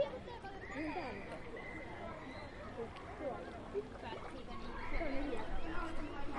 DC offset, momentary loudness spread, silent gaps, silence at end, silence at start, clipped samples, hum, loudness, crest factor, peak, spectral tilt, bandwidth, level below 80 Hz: under 0.1%; 7 LU; none; 0 s; 0 s; under 0.1%; none; -45 LUFS; 16 dB; -26 dBFS; -6 dB/octave; 10.5 kHz; -48 dBFS